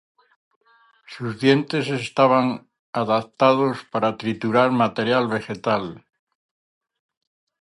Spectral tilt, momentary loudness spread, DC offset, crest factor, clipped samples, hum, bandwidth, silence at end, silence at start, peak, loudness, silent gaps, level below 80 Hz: -6.5 dB/octave; 13 LU; under 0.1%; 20 dB; under 0.1%; none; 11.5 kHz; 1.75 s; 1.1 s; -2 dBFS; -21 LUFS; 2.79-2.93 s; -64 dBFS